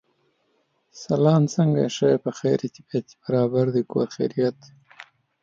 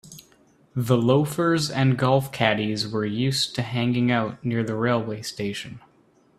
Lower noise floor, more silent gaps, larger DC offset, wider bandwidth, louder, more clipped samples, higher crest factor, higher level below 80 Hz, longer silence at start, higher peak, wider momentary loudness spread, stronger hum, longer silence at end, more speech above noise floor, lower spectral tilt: first, -69 dBFS vs -59 dBFS; neither; neither; second, 7.6 kHz vs 14.5 kHz; about the same, -23 LUFS vs -23 LUFS; neither; about the same, 18 dB vs 20 dB; second, -68 dBFS vs -58 dBFS; first, 0.95 s vs 0.05 s; about the same, -6 dBFS vs -4 dBFS; about the same, 10 LU vs 10 LU; neither; second, 0.4 s vs 0.6 s; first, 47 dB vs 36 dB; first, -7.5 dB/octave vs -5.5 dB/octave